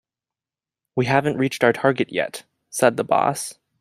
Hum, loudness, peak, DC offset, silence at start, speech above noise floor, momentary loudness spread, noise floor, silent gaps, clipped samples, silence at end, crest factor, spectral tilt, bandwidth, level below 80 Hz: none; -21 LUFS; -2 dBFS; under 0.1%; 0.95 s; over 70 dB; 12 LU; under -90 dBFS; none; under 0.1%; 0.3 s; 20 dB; -5 dB/octave; 16 kHz; -62 dBFS